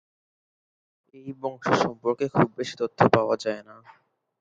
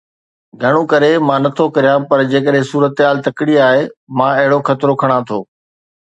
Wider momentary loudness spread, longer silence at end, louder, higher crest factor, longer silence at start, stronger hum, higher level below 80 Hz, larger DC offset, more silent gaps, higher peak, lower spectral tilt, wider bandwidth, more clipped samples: first, 15 LU vs 5 LU; about the same, 0.7 s vs 0.6 s; second, -25 LUFS vs -13 LUFS; first, 26 dB vs 14 dB; first, 1.15 s vs 0.6 s; neither; about the same, -60 dBFS vs -60 dBFS; neither; second, none vs 3.97-4.07 s; about the same, -2 dBFS vs 0 dBFS; about the same, -6 dB/octave vs -7 dB/octave; about the same, 9 kHz vs 8.4 kHz; neither